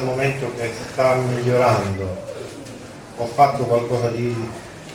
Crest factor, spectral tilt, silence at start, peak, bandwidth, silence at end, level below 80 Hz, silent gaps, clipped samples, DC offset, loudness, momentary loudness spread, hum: 20 dB; -6.5 dB/octave; 0 s; -2 dBFS; 17 kHz; 0 s; -52 dBFS; none; under 0.1%; under 0.1%; -21 LUFS; 18 LU; none